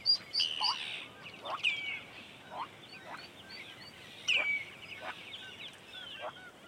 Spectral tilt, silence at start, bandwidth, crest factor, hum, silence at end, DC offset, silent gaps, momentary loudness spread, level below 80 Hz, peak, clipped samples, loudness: -0.5 dB/octave; 0 s; 16 kHz; 20 dB; none; 0 s; under 0.1%; none; 18 LU; -76 dBFS; -18 dBFS; under 0.1%; -35 LUFS